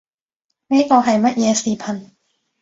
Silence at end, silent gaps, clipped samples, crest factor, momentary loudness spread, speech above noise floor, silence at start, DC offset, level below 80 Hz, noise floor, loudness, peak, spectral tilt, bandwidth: 0.6 s; none; under 0.1%; 18 dB; 13 LU; 61 dB; 0.7 s; under 0.1%; -62 dBFS; -77 dBFS; -16 LUFS; 0 dBFS; -4.5 dB/octave; 8 kHz